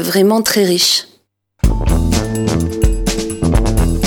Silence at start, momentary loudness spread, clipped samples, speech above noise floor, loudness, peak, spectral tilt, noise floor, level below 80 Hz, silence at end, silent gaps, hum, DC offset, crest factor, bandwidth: 0 s; 7 LU; under 0.1%; 43 dB; -15 LUFS; 0 dBFS; -4.5 dB/octave; -56 dBFS; -20 dBFS; 0 s; none; none; under 0.1%; 14 dB; 18.5 kHz